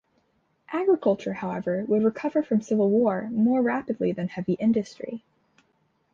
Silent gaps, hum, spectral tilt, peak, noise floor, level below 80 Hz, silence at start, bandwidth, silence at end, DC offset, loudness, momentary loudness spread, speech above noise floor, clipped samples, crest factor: none; none; -8 dB/octave; -10 dBFS; -69 dBFS; -66 dBFS; 0.7 s; 7.4 kHz; 0.95 s; under 0.1%; -25 LUFS; 9 LU; 45 dB; under 0.1%; 16 dB